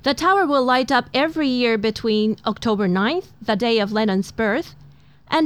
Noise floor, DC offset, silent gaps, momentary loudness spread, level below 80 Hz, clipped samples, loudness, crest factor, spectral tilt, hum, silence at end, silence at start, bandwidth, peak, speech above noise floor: -48 dBFS; 0.2%; none; 6 LU; -52 dBFS; under 0.1%; -20 LUFS; 16 dB; -5.5 dB/octave; none; 0 s; 0.05 s; 14 kHz; -4 dBFS; 29 dB